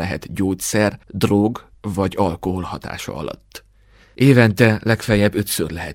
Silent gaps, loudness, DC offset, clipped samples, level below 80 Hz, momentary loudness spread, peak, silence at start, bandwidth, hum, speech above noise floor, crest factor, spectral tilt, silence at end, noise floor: none; -18 LUFS; under 0.1%; under 0.1%; -44 dBFS; 15 LU; 0 dBFS; 0 s; 16.5 kHz; none; 33 dB; 18 dB; -5.5 dB/octave; 0 s; -51 dBFS